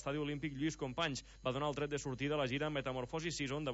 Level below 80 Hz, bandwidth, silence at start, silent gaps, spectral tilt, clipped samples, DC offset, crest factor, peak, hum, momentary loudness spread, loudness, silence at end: -60 dBFS; 7.6 kHz; 0 s; none; -4 dB/octave; under 0.1%; under 0.1%; 18 dB; -22 dBFS; none; 4 LU; -39 LUFS; 0 s